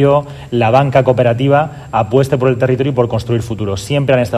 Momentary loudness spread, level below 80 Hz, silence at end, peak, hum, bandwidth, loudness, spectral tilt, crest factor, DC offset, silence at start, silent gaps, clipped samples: 7 LU; -42 dBFS; 0 s; 0 dBFS; none; 13.5 kHz; -14 LUFS; -7 dB/octave; 12 dB; under 0.1%; 0 s; none; 0.3%